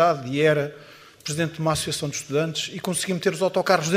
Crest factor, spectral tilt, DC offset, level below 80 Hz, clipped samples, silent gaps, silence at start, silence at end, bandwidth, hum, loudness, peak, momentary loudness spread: 20 dB; -4 dB/octave; under 0.1%; -58 dBFS; under 0.1%; none; 0 s; 0 s; 15.5 kHz; none; -24 LUFS; -4 dBFS; 9 LU